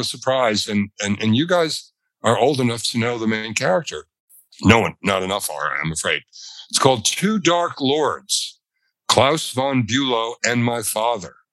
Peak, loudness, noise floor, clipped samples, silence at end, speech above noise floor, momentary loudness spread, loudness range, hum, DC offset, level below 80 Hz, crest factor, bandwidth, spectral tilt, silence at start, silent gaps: 0 dBFS; -19 LUFS; -73 dBFS; under 0.1%; 0.25 s; 53 dB; 8 LU; 2 LU; none; under 0.1%; -60 dBFS; 20 dB; 14 kHz; -4 dB/octave; 0 s; 4.20-4.28 s